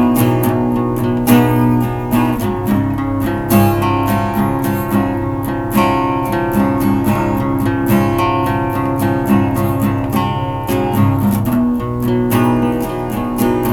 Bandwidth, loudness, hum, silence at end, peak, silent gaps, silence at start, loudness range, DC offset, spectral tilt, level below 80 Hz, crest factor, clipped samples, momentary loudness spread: 19.5 kHz; -15 LUFS; none; 0 s; 0 dBFS; none; 0 s; 1 LU; under 0.1%; -7 dB/octave; -34 dBFS; 14 dB; under 0.1%; 5 LU